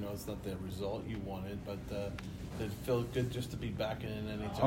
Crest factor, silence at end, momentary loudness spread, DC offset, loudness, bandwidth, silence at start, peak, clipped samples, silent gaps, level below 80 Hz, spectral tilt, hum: 22 dB; 0 s; 7 LU; under 0.1%; -40 LUFS; 16 kHz; 0 s; -16 dBFS; under 0.1%; none; -52 dBFS; -6.5 dB/octave; none